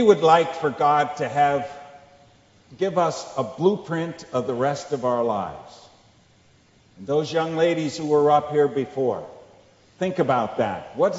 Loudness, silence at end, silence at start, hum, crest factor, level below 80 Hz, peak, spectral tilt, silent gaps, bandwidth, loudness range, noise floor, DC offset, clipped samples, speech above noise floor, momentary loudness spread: -22 LUFS; 0 s; 0 s; none; 22 dB; -64 dBFS; -2 dBFS; -6 dB/octave; none; 8 kHz; 4 LU; -57 dBFS; under 0.1%; under 0.1%; 35 dB; 11 LU